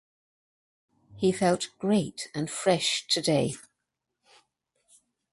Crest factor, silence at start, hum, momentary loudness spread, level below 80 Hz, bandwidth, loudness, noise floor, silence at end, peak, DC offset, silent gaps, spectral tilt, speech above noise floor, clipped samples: 20 dB; 1.1 s; none; 9 LU; -66 dBFS; 11.5 kHz; -27 LUFS; -84 dBFS; 1.7 s; -10 dBFS; under 0.1%; none; -4 dB/octave; 57 dB; under 0.1%